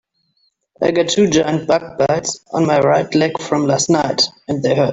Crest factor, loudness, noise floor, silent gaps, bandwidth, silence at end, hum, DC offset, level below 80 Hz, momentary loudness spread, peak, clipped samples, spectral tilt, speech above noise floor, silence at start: 14 dB; -16 LUFS; -64 dBFS; none; 8.2 kHz; 0 s; none; under 0.1%; -52 dBFS; 5 LU; -2 dBFS; under 0.1%; -4.5 dB/octave; 48 dB; 0.8 s